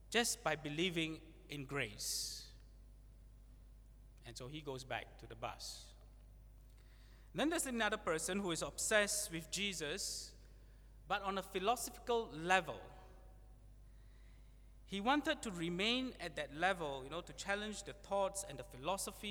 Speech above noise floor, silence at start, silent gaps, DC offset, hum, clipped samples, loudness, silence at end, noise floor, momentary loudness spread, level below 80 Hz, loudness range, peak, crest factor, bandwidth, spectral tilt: 20 dB; 0 s; none; under 0.1%; none; under 0.1%; -40 LUFS; 0 s; -60 dBFS; 14 LU; -60 dBFS; 12 LU; -16 dBFS; 26 dB; over 20 kHz; -2.5 dB/octave